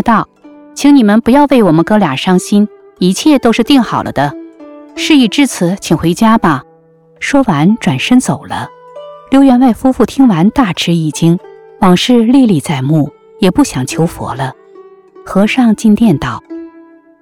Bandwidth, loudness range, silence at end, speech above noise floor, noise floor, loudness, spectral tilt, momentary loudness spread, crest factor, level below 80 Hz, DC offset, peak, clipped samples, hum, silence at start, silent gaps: 16 kHz; 3 LU; 0.5 s; 36 dB; -45 dBFS; -10 LUFS; -5.5 dB/octave; 12 LU; 10 dB; -40 dBFS; 0.4%; 0 dBFS; under 0.1%; none; 0 s; none